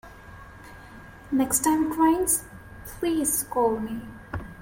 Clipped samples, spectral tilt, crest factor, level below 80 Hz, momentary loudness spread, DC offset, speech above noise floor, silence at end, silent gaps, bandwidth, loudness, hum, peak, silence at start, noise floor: under 0.1%; -4 dB/octave; 18 dB; -48 dBFS; 24 LU; under 0.1%; 21 dB; 0 s; none; 17 kHz; -24 LUFS; none; -8 dBFS; 0.05 s; -45 dBFS